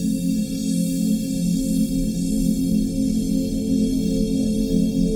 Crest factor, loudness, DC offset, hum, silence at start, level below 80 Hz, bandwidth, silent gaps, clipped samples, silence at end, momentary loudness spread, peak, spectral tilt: 12 dB; -22 LUFS; under 0.1%; none; 0 s; -34 dBFS; 17 kHz; none; under 0.1%; 0 s; 2 LU; -8 dBFS; -6.5 dB/octave